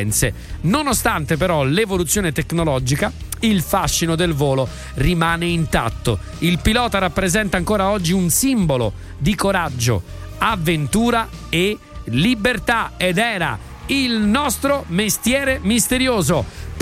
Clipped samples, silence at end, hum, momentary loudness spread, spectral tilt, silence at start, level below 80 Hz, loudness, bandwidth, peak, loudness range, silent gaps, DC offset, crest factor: under 0.1%; 0 s; none; 5 LU; -4.5 dB/octave; 0 s; -32 dBFS; -18 LUFS; 16.5 kHz; -2 dBFS; 1 LU; none; under 0.1%; 16 dB